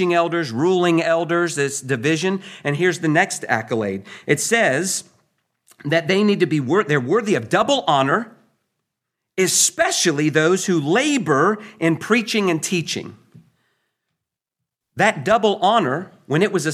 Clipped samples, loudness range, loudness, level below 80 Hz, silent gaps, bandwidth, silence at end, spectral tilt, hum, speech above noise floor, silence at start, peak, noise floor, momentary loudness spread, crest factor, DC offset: under 0.1%; 4 LU; -19 LUFS; -66 dBFS; none; 15.5 kHz; 0 s; -4 dB/octave; none; 64 dB; 0 s; -2 dBFS; -83 dBFS; 7 LU; 18 dB; under 0.1%